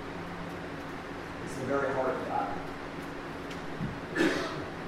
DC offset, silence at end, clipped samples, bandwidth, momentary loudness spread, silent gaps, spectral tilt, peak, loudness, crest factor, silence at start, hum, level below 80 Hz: under 0.1%; 0 s; under 0.1%; 16 kHz; 10 LU; none; -5.5 dB/octave; -16 dBFS; -34 LUFS; 20 dB; 0 s; none; -54 dBFS